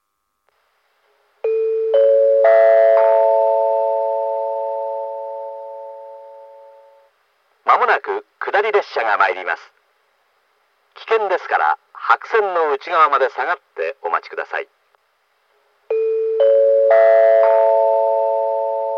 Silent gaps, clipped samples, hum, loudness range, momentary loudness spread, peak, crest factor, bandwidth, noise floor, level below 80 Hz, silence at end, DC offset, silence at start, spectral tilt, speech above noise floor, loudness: none; under 0.1%; none; 9 LU; 15 LU; 0 dBFS; 16 dB; 6.4 kHz; -68 dBFS; under -90 dBFS; 0 s; under 0.1%; 1.45 s; -2.5 dB/octave; 50 dB; -16 LUFS